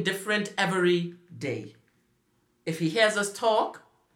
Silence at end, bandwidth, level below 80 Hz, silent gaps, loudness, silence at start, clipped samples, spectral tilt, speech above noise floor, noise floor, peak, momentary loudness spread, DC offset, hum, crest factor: 0.35 s; 17 kHz; -78 dBFS; none; -27 LUFS; 0 s; under 0.1%; -4.5 dB/octave; 43 dB; -70 dBFS; -10 dBFS; 13 LU; under 0.1%; none; 20 dB